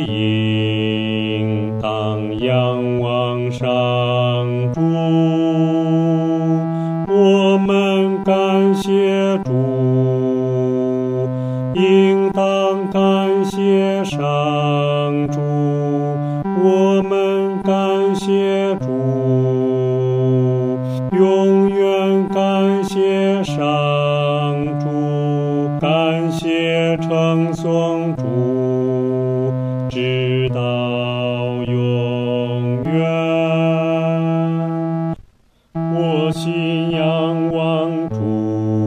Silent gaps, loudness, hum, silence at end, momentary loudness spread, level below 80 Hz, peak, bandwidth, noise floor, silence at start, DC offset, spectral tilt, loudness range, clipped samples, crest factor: none; -17 LUFS; none; 0 s; 6 LU; -52 dBFS; -2 dBFS; 11 kHz; -53 dBFS; 0 s; under 0.1%; -7.5 dB/octave; 3 LU; under 0.1%; 14 dB